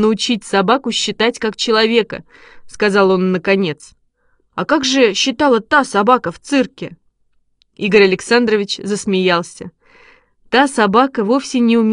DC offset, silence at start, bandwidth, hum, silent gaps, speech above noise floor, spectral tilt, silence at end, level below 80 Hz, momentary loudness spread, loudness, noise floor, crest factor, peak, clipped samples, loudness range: under 0.1%; 0 s; 11 kHz; none; none; 45 dB; -4 dB/octave; 0 s; -54 dBFS; 11 LU; -15 LUFS; -60 dBFS; 16 dB; 0 dBFS; under 0.1%; 1 LU